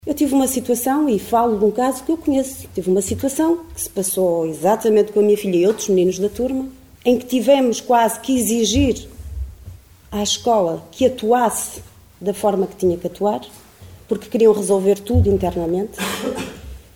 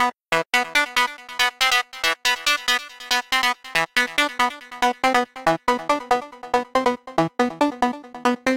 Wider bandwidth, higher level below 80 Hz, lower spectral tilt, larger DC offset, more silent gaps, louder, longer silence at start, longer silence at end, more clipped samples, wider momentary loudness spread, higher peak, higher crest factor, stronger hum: about the same, 18 kHz vs 17 kHz; first, -40 dBFS vs -56 dBFS; first, -5 dB/octave vs -2 dB/octave; about the same, 0.1% vs 0.2%; neither; first, -18 LUFS vs -21 LUFS; about the same, 0.05 s vs 0 s; first, 0.2 s vs 0 s; neither; first, 11 LU vs 5 LU; first, -2 dBFS vs -6 dBFS; about the same, 16 dB vs 16 dB; neither